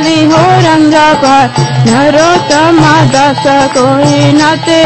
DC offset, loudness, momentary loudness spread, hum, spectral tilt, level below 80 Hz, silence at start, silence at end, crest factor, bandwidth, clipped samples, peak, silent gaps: under 0.1%; -6 LUFS; 3 LU; none; -5 dB/octave; -38 dBFS; 0 s; 0 s; 6 dB; 11 kHz; 2%; 0 dBFS; none